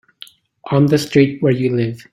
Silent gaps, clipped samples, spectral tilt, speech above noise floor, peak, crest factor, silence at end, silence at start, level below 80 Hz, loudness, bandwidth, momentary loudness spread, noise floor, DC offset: none; under 0.1%; -7 dB/octave; 28 dB; -2 dBFS; 14 dB; 0.15 s; 0.65 s; -52 dBFS; -16 LUFS; 14.5 kHz; 6 LU; -43 dBFS; under 0.1%